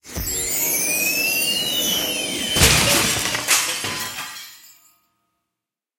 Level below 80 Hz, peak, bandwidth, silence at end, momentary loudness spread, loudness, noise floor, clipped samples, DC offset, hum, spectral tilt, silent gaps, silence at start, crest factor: -38 dBFS; 0 dBFS; 16.5 kHz; 1.3 s; 13 LU; -18 LUFS; -85 dBFS; under 0.1%; under 0.1%; none; -1.5 dB/octave; none; 0.05 s; 22 dB